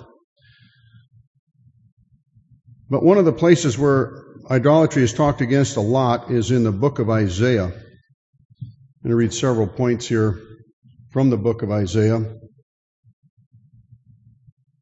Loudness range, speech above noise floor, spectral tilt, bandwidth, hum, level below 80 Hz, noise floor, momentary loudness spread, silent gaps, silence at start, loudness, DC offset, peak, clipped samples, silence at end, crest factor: 6 LU; 36 dB; -6.5 dB/octave; 8.2 kHz; none; -52 dBFS; -53 dBFS; 14 LU; 0.24-0.36 s, 1.27-1.47 s, 1.92-1.97 s, 8.14-8.33 s, 8.45-8.49 s, 10.73-10.82 s; 0 s; -19 LUFS; under 0.1%; -2 dBFS; under 0.1%; 2.45 s; 20 dB